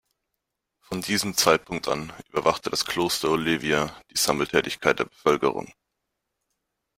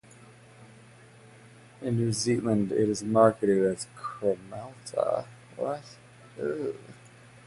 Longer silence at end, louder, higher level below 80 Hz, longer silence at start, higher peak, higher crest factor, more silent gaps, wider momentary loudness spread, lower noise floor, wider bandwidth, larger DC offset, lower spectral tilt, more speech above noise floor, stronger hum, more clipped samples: first, 1.3 s vs 0.55 s; first, -24 LUFS vs -28 LUFS; first, -56 dBFS vs -64 dBFS; first, 0.9 s vs 0.6 s; first, -2 dBFS vs -8 dBFS; about the same, 24 dB vs 22 dB; neither; second, 8 LU vs 18 LU; first, -82 dBFS vs -53 dBFS; first, 16.5 kHz vs 11.5 kHz; neither; second, -3 dB/octave vs -6 dB/octave; first, 57 dB vs 25 dB; neither; neither